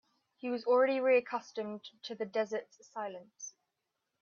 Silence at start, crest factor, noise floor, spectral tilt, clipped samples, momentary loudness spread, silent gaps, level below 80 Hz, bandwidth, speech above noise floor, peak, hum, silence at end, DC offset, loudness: 0.45 s; 18 dB; -86 dBFS; -3.5 dB/octave; under 0.1%; 19 LU; none; -88 dBFS; 7.2 kHz; 52 dB; -18 dBFS; none; 0.7 s; under 0.1%; -33 LUFS